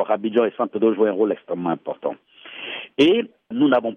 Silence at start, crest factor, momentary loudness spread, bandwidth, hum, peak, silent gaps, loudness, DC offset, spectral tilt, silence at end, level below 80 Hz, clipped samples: 0 s; 16 dB; 14 LU; 7 kHz; none; -6 dBFS; none; -21 LUFS; under 0.1%; -6.5 dB/octave; 0 s; -68 dBFS; under 0.1%